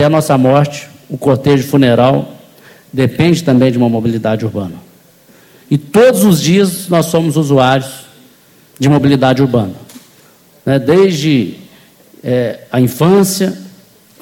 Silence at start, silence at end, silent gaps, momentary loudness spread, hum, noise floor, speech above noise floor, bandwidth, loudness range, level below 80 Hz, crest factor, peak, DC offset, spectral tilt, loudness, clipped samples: 0 s; 0.5 s; none; 14 LU; none; -45 dBFS; 35 dB; 17 kHz; 3 LU; -48 dBFS; 12 dB; 0 dBFS; under 0.1%; -6 dB/octave; -12 LUFS; under 0.1%